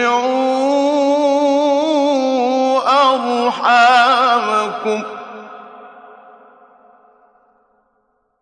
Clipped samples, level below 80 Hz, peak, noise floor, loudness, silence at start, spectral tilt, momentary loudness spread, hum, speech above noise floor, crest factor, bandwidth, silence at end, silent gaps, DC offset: under 0.1%; -72 dBFS; -2 dBFS; -64 dBFS; -14 LUFS; 0 s; -3 dB/octave; 15 LU; none; 51 dB; 14 dB; 9.8 kHz; 2.45 s; none; under 0.1%